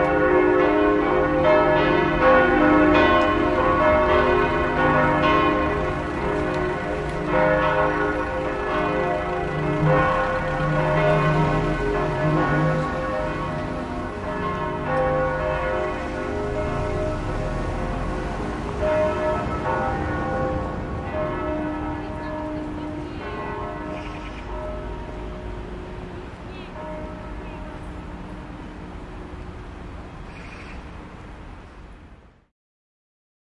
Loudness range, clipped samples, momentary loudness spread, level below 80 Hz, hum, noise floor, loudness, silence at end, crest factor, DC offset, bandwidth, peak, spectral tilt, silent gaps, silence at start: 19 LU; under 0.1%; 19 LU; -36 dBFS; none; -48 dBFS; -22 LUFS; 1.35 s; 18 dB; under 0.1%; 11 kHz; -4 dBFS; -7.5 dB/octave; none; 0 s